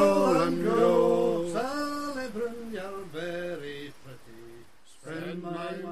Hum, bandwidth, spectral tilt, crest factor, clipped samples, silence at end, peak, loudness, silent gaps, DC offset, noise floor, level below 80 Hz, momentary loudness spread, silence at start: none; 14.5 kHz; -6 dB/octave; 18 dB; under 0.1%; 0 s; -12 dBFS; -28 LUFS; none; 0.6%; -54 dBFS; -60 dBFS; 22 LU; 0 s